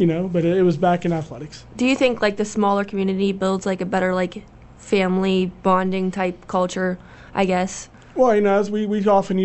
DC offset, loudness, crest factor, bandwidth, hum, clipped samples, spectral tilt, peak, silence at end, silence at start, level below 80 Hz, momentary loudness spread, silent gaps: under 0.1%; -20 LUFS; 16 dB; 8.4 kHz; none; under 0.1%; -6 dB/octave; -4 dBFS; 0 s; 0 s; -50 dBFS; 10 LU; none